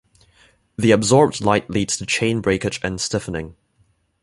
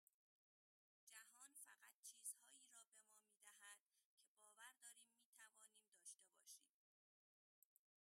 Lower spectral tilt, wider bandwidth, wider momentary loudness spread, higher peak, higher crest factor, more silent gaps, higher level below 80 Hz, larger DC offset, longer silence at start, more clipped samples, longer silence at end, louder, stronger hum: first, -4.5 dB/octave vs 3.5 dB/octave; second, 11.5 kHz vs 16 kHz; about the same, 14 LU vs 12 LU; first, -2 dBFS vs -40 dBFS; second, 20 dB vs 28 dB; second, none vs 1.94-2.03 s, 3.80-3.86 s, 4.05-4.18 s, 4.28-4.35 s, 5.25-5.33 s, 5.88-5.92 s; first, -46 dBFS vs under -90 dBFS; neither; second, 0.8 s vs 1.05 s; neither; second, 0.7 s vs 1.5 s; first, -19 LUFS vs -63 LUFS; neither